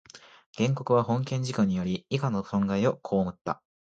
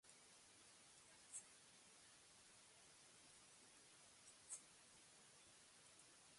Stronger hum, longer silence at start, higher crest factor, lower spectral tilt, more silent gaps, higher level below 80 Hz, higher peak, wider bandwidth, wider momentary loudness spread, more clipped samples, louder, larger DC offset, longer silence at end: neither; about the same, 0.15 s vs 0.05 s; second, 18 dB vs 26 dB; first, -7 dB/octave vs -0.5 dB/octave; first, 0.46-0.53 s vs none; first, -58 dBFS vs under -90 dBFS; first, -10 dBFS vs -42 dBFS; second, 8.8 kHz vs 11.5 kHz; second, 6 LU vs 9 LU; neither; first, -28 LUFS vs -64 LUFS; neither; first, 0.3 s vs 0 s